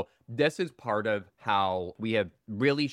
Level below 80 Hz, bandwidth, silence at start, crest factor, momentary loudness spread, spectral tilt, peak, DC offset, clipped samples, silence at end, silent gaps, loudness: -68 dBFS; 12.5 kHz; 0 s; 18 dB; 6 LU; -6 dB/octave; -12 dBFS; under 0.1%; under 0.1%; 0 s; none; -30 LUFS